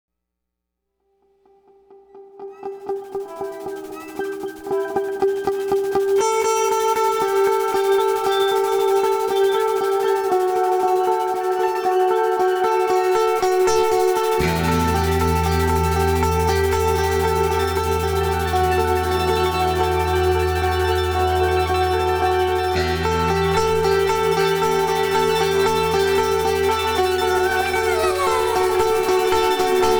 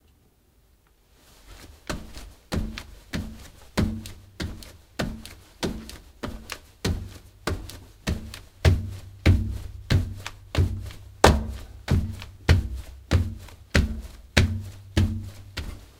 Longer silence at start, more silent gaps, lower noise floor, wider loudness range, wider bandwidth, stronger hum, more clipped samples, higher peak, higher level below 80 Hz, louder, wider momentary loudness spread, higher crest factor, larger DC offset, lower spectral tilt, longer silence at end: first, 2.15 s vs 1.5 s; neither; first, -80 dBFS vs -61 dBFS; about the same, 7 LU vs 9 LU; first, over 20 kHz vs 16.5 kHz; neither; neither; second, -8 dBFS vs 0 dBFS; about the same, -34 dBFS vs -34 dBFS; first, -19 LUFS vs -28 LUFS; second, 5 LU vs 18 LU; second, 10 dB vs 28 dB; neither; about the same, -5 dB/octave vs -5.5 dB/octave; second, 0 s vs 0.15 s